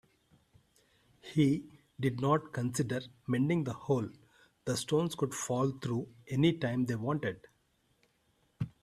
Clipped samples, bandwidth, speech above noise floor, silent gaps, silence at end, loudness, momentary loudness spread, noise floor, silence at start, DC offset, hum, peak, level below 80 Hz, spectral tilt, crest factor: under 0.1%; 14.5 kHz; 41 dB; none; 0.15 s; -33 LUFS; 12 LU; -73 dBFS; 1.25 s; under 0.1%; none; -14 dBFS; -66 dBFS; -6 dB/octave; 20 dB